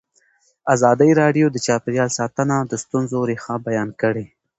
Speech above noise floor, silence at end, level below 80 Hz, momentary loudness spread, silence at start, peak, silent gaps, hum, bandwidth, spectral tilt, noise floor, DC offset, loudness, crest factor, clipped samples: 42 dB; 0.35 s; -58 dBFS; 9 LU; 0.65 s; 0 dBFS; none; none; 8.2 kHz; -5.5 dB/octave; -61 dBFS; under 0.1%; -19 LUFS; 18 dB; under 0.1%